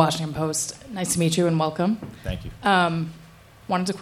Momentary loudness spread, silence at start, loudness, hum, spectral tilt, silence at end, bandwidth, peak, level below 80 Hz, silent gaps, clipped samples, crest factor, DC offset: 12 LU; 0 s; -24 LUFS; none; -4.5 dB/octave; 0 s; 16 kHz; -2 dBFS; -46 dBFS; none; under 0.1%; 22 dB; under 0.1%